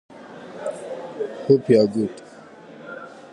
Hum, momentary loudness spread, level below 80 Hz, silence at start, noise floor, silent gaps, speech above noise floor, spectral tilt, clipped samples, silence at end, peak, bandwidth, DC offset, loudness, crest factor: none; 25 LU; -68 dBFS; 0.15 s; -43 dBFS; none; 25 dB; -7.5 dB/octave; under 0.1%; 0.05 s; -2 dBFS; 10.5 kHz; under 0.1%; -22 LUFS; 20 dB